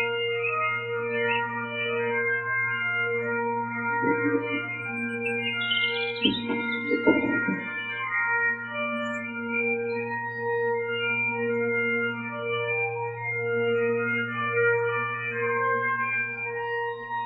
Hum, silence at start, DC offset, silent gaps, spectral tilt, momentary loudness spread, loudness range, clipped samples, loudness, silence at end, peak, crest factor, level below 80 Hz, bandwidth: none; 0 s; under 0.1%; none; -6.5 dB/octave; 6 LU; 1 LU; under 0.1%; -26 LUFS; 0 s; -8 dBFS; 20 dB; -70 dBFS; 8.2 kHz